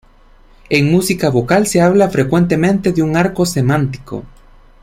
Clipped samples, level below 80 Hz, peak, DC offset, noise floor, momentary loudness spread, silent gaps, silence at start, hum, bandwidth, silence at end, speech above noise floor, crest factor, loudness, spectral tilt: under 0.1%; -40 dBFS; -2 dBFS; under 0.1%; -45 dBFS; 7 LU; none; 0.7 s; none; 16.5 kHz; 0.55 s; 32 dB; 14 dB; -14 LUFS; -6 dB/octave